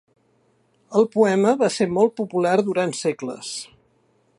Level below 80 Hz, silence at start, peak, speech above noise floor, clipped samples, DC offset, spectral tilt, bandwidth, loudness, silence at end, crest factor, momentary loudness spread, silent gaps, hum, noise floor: -66 dBFS; 0.9 s; -4 dBFS; 43 dB; under 0.1%; under 0.1%; -5 dB/octave; 11.5 kHz; -21 LUFS; 0.75 s; 18 dB; 13 LU; none; none; -63 dBFS